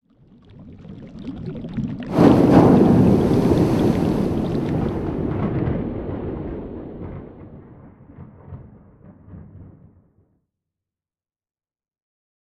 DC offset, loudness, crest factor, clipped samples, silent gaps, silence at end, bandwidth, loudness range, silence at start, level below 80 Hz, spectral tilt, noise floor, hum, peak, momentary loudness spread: under 0.1%; -18 LUFS; 20 dB; under 0.1%; none; 2.85 s; 13.5 kHz; 20 LU; 0.6 s; -38 dBFS; -9 dB/octave; under -90 dBFS; none; -2 dBFS; 26 LU